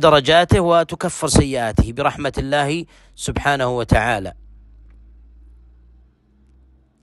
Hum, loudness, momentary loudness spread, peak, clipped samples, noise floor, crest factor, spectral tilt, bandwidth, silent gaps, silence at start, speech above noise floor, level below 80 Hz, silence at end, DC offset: none; -18 LUFS; 12 LU; 0 dBFS; under 0.1%; -54 dBFS; 18 dB; -5 dB/octave; 12.5 kHz; none; 0 s; 37 dB; -32 dBFS; 2.7 s; under 0.1%